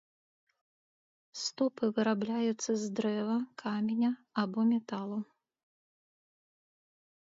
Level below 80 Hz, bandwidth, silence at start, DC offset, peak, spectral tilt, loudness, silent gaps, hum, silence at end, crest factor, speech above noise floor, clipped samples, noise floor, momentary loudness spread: -82 dBFS; 7.8 kHz; 1.35 s; under 0.1%; -18 dBFS; -5 dB/octave; -33 LUFS; none; none; 2.15 s; 16 dB; over 58 dB; under 0.1%; under -90 dBFS; 8 LU